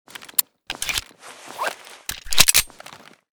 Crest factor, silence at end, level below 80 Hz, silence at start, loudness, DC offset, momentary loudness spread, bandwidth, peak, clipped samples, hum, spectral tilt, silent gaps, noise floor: 24 dB; 0.3 s; -44 dBFS; 0.1 s; -20 LUFS; under 0.1%; 22 LU; over 20 kHz; 0 dBFS; under 0.1%; none; 0.5 dB/octave; none; -44 dBFS